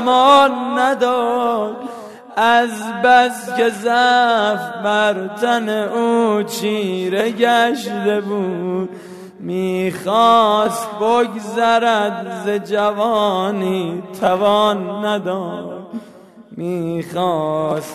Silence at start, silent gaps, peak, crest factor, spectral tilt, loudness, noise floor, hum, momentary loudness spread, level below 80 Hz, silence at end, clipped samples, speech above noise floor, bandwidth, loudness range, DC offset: 0 s; none; 0 dBFS; 16 dB; -4.5 dB/octave; -17 LUFS; -41 dBFS; none; 13 LU; -66 dBFS; 0 s; under 0.1%; 25 dB; 14 kHz; 4 LU; under 0.1%